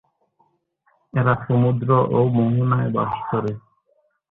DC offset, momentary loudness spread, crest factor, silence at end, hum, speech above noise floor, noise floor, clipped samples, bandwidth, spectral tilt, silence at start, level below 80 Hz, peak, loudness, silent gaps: under 0.1%; 8 LU; 18 dB; 0.7 s; none; 46 dB; -65 dBFS; under 0.1%; 3.9 kHz; -11.5 dB/octave; 1.15 s; -52 dBFS; -4 dBFS; -20 LUFS; none